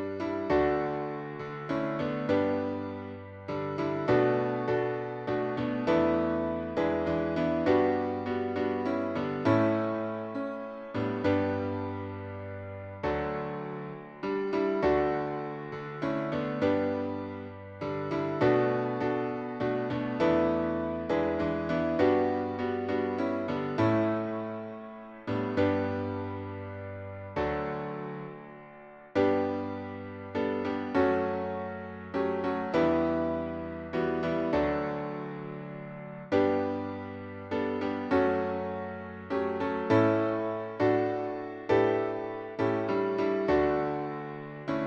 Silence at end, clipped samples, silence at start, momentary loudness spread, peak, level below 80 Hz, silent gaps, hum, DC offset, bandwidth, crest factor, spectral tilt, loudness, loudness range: 0 s; under 0.1%; 0 s; 13 LU; -12 dBFS; -56 dBFS; none; none; under 0.1%; 7.2 kHz; 18 dB; -8.5 dB/octave; -30 LUFS; 5 LU